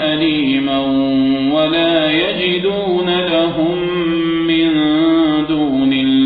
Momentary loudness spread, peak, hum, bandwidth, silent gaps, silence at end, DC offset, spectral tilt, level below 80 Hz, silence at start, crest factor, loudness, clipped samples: 3 LU; -2 dBFS; none; 4.9 kHz; none; 0 s; under 0.1%; -8.5 dB/octave; -46 dBFS; 0 s; 12 dB; -14 LUFS; under 0.1%